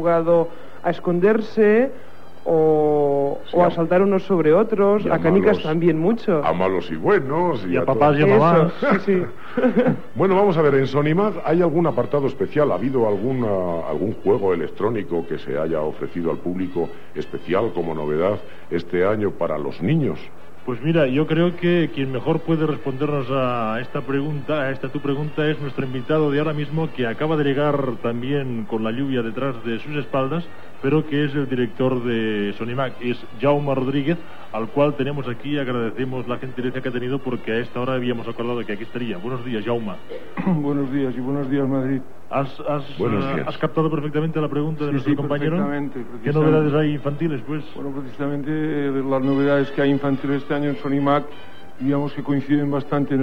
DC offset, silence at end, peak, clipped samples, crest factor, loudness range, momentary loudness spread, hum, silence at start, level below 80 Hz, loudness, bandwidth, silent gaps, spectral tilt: 3%; 0 s; -4 dBFS; under 0.1%; 16 dB; 7 LU; 10 LU; none; 0 s; -56 dBFS; -21 LUFS; 7.6 kHz; none; -9 dB/octave